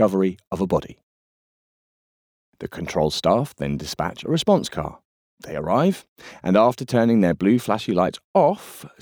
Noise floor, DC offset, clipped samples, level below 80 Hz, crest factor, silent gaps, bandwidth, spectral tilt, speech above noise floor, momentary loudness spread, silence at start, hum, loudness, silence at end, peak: under -90 dBFS; under 0.1%; under 0.1%; -50 dBFS; 18 dB; 0.47-0.51 s, 1.03-2.53 s, 5.05-5.37 s, 6.08-6.16 s, 8.24-8.34 s; 19.5 kHz; -6.5 dB/octave; over 69 dB; 14 LU; 0 s; none; -21 LUFS; 0.15 s; -4 dBFS